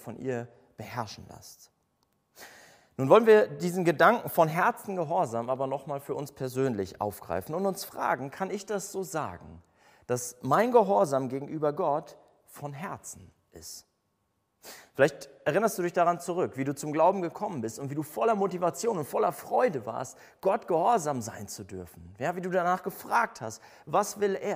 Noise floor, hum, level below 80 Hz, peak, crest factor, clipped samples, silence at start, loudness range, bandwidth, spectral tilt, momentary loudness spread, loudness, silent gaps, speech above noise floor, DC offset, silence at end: -76 dBFS; none; -68 dBFS; -6 dBFS; 24 dB; under 0.1%; 0 s; 9 LU; 16 kHz; -5.5 dB/octave; 20 LU; -28 LUFS; none; 48 dB; under 0.1%; 0 s